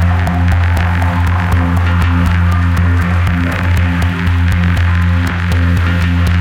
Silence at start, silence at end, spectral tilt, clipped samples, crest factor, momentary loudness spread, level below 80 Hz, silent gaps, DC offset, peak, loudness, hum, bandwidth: 0 s; 0 s; -7 dB/octave; under 0.1%; 12 dB; 2 LU; -20 dBFS; none; under 0.1%; 0 dBFS; -13 LUFS; none; 10 kHz